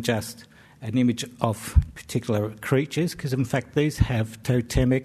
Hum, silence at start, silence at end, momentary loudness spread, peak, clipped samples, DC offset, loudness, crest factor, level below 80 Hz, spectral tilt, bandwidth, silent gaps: none; 0 s; 0 s; 6 LU; -4 dBFS; under 0.1%; under 0.1%; -25 LUFS; 20 dB; -34 dBFS; -6 dB/octave; 13.5 kHz; none